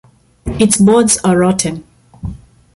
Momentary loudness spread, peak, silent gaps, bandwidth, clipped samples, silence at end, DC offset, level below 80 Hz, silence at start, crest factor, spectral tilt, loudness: 20 LU; 0 dBFS; none; 12 kHz; under 0.1%; 0.4 s; under 0.1%; -36 dBFS; 0.45 s; 14 dB; -4.5 dB/octave; -11 LUFS